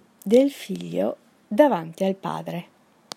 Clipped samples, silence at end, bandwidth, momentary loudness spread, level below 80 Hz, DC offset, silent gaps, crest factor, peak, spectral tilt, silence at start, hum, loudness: under 0.1%; 0.55 s; 16 kHz; 14 LU; -72 dBFS; under 0.1%; none; 20 dB; -4 dBFS; -6.5 dB/octave; 0.25 s; none; -23 LUFS